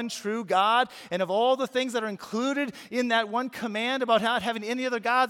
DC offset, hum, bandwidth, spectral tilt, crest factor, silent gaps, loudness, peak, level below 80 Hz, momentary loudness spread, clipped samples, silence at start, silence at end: under 0.1%; none; 16.5 kHz; -3.5 dB/octave; 18 dB; none; -27 LUFS; -8 dBFS; -74 dBFS; 7 LU; under 0.1%; 0 s; 0 s